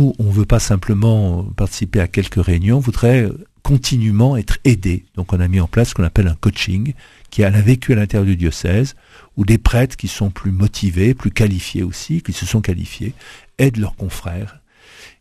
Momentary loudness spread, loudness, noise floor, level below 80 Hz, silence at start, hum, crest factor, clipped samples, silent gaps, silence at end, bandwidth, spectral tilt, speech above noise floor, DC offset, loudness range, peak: 11 LU; -17 LUFS; -43 dBFS; -26 dBFS; 0 s; none; 16 dB; under 0.1%; none; 0.15 s; 14 kHz; -6.5 dB/octave; 28 dB; under 0.1%; 3 LU; 0 dBFS